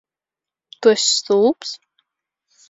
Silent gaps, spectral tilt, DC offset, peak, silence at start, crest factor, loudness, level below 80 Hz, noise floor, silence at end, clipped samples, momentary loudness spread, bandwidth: none; -2 dB/octave; under 0.1%; -2 dBFS; 0.8 s; 20 dB; -17 LUFS; -70 dBFS; -89 dBFS; 0.95 s; under 0.1%; 15 LU; 7.8 kHz